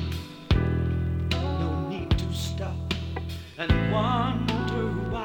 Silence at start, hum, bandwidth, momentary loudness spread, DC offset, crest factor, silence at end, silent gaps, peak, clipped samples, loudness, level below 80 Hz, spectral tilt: 0 s; none; 18 kHz; 9 LU; under 0.1%; 18 dB; 0 s; none; -8 dBFS; under 0.1%; -28 LUFS; -34 dBFS; -6.5 dB/octave